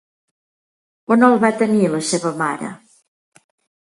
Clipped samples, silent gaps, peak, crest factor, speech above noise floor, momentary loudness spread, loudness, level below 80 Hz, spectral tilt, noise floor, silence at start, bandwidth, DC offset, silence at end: under 0.1%; none; 0 dBFS; 20 dB; over 74 dB; 11 LU; -17 LUFS; -66 dBFS; -5 dB/octave; under -90 dBFS; 1.1 s; 11.5 kHz; under 0.1%; 1.1 s